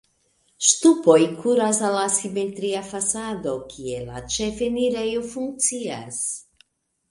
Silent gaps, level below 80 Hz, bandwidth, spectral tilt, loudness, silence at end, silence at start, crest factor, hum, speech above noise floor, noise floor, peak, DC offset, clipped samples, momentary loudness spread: none; -54 dBFS; 11.5 kHz; -3 dB/octave; -22 LUFS; 0.7 s; 0.6 s; 22 dB; none; 43 dB; -65 dBFS; -2 dBFS; under 0.1%; under 0.1%; 14 LU